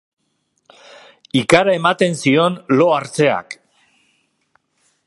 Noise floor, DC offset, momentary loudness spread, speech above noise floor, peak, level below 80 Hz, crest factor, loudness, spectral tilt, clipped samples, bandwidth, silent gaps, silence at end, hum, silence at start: -68 dBFS; under 0.1%; 10 LU; 53 dB; 0 dBFS; -60 dBFS; 18 dB; -15 LUFS; -5 dB/octave; under 0.1%; 11.5 kHz; none; 1.55 s; none; 1.35 s